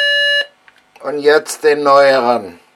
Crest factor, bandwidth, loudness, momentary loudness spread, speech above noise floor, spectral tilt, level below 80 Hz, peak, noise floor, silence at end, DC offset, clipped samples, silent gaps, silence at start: 14 dB; 14 kHz; -12 LUFS; 14 LU; 36 dB; -2 dB/octave; -68 dBFS; 0 dBFS; -48 dBFS; 0.25 s; under 0.1%; under 0.1%; none; 0 s